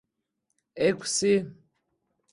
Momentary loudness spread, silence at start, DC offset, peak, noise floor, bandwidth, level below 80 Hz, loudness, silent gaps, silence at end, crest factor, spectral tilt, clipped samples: 5 LU; 0.75 s; under 0.1%; -10 dBFS; -80 dBFS; 11.5 kHz; -68 dBFS; -26 LUFS; none; 0.8 s; 18 dB; -3.5 dB/octave; under 0.1%